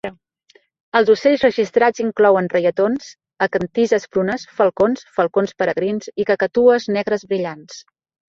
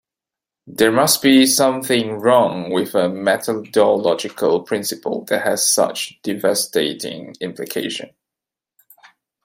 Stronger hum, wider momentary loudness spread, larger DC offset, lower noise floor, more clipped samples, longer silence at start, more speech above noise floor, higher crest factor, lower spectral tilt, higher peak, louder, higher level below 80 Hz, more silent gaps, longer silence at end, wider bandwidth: neither; second, 9 LU vs 13 LU; neither; second, -56 dBFS vs -87 dBFS; neither; second, 0.05 s vs 0.65 s; second, 39 dB vs 70 dB; about the same, 16 dB vs 18 dB; first, -5.5 dB/octave vs -3 dB/octave; about the same, -2 dBFS vs -2 dBFS; about the same, -18 LUFS vs -17 LUFS; first, -58 dBFS vs -64 dBFS; first, 0.80-0.92 s vs none; second, 0.5 s vs 1.35 s; second, 7.6 kHz vs 16.5 kHz